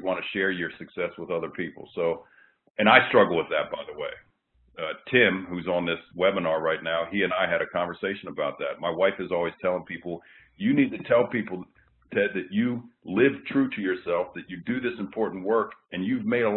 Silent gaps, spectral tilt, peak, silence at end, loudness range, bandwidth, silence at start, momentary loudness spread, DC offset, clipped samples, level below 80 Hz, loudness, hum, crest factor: 2.70-2.74 s; -10 dB/octave; -2 dBFS; 0 s; 4 LU; 4.2 kHz; 0 s; 14 LU; under 0.1%; under 0.1%; -64 dBFS; -26 LUFS; none; 24 dB